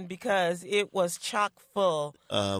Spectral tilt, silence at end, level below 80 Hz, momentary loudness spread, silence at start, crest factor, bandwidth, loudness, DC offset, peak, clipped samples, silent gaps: -3.5 dB/octave; 0 s; -72 dBFS; 4 LU; 0 s; 16 dB; 16 kHz; -29 LUFS; under 0.1%; -12 dBFS; under 0.1%; none